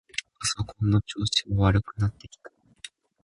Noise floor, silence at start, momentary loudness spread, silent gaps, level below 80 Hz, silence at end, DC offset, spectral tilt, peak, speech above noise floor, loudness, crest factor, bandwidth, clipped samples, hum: -48 dBFS; 0.4 s; 21 LU; none; -42 dBFS; 0.35 s; under 0.1%; -4.5 dB/octave; -8 dBFS; 23 dB; -26 LUFS; 20 dB; 11.5 kHz; under 0.1%; none